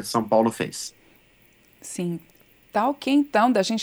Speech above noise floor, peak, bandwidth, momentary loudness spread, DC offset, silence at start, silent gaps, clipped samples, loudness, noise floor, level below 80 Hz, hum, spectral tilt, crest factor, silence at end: 35 dB; -6 dBFS; over 20 kHz; 16 LU; under 0.1%; 0 s; none; under 0.1%; -23 LUFS; -58 dBFS; -66 dBFS; 60 Hz at -65 dBFS; -4.5 dB/octave; 18 dB; 0 s